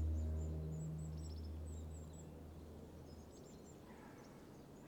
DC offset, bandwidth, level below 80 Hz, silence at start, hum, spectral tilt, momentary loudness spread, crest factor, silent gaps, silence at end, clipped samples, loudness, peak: under 0.1%; 19 kHz; -54 dBFS; 0 s; none; -7 dB/octave; 14 LU; 14 dB; none; 0 s; under 0.1%; -50 LUFS; -34 dBFS